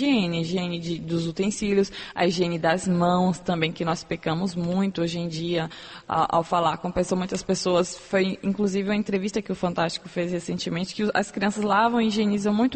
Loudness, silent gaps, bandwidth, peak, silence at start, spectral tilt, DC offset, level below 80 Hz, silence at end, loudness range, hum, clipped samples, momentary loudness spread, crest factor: -25 LUFS; none; 8.8 kHz; -8 dBFS; 0 s; -5.5 dB/octave; under 0.1%; -54 dBFS; 0 s; 2 LU; none; under 0.1%; 6 LU; 16 dB